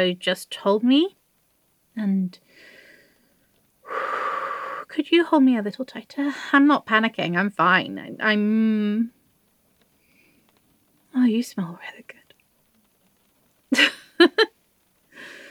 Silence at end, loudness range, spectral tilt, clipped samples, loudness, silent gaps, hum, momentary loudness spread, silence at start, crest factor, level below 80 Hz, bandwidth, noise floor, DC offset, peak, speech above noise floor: 0.05 s; 9 LU; -5 dB/octave; under 0.1%; -22 LUFS; none; none; 15 LU; 0 s; 22 dB; -80 dBFS; 14.5 kHz; -66 dBFS; under 0.1%; -2 dBFS; 44 dB